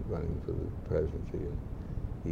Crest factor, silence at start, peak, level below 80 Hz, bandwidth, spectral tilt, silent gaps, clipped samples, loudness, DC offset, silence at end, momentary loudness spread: 16 dB; 0 s; -18 dBFS; -40 dBFS; 7.2 kHz; -10 dB/octave; none; under 0.1%; -37 LUFS; under 0.1%; 0 s; 7 LU